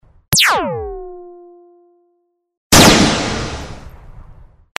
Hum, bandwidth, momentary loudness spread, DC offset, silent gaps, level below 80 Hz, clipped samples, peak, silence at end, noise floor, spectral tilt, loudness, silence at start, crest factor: none; 15.5 kHz; 23 LU; under 0.1%; 2.57-2.70 s; -32 dBFS; under 0.1%; 0 dBFS; 0.45 s; -65 dBFS; -3 dB/octave; -12 LUFS; 0.3 s; 18 dB